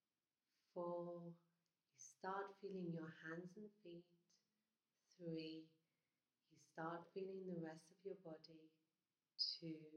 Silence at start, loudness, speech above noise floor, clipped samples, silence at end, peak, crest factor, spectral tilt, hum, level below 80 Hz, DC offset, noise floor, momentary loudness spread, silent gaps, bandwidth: 0.75 s; -52 LUFS; over 37 dB; under 0.1%; 0 s; -32 dBFS; 22 dB; -5 dB/octave; none; under -90 dBFS; under 0.1%; under -90 dBFS; 16 LU; none; 10 kHz